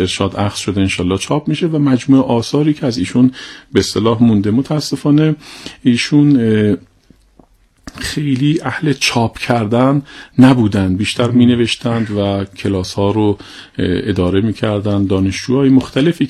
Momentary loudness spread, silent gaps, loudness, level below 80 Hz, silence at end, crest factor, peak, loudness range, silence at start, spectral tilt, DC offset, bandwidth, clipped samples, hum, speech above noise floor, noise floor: 7 LU; none; -14 LUFS; -44 dBFS; 0 s; 14 dB; 0 dBFS; 3 LU; 0 s; -6 dB/octave; under 0.1%; 13 kHz; under 0.1%; none; 36 dB; -49 dBFS